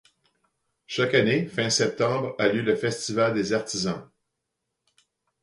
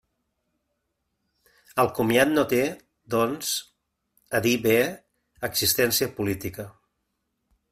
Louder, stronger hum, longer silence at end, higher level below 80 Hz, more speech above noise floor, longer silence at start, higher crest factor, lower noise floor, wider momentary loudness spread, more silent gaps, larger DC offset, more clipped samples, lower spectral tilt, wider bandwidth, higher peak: about the same, -24 LUFS vs -24 LUFS; neither; first, 1.4 s vs 1 s; about the same, -64 dBFS vs -60 dBFS; about the same, 57 dB vs 54 dB; second, 0.9 s vs 1.75 s; about the same, 20 dB vs 20 dB; about the same, -81 dBFS vs -78 dBFS; second, 7 LU vs 14 LU; neither; neither; neither; about the same, -4 dB/octave vs -3.5 dB/octave; second, 11.5 kHz vs 16 kHz; about the same, -6 dBFS vs -6 dBFS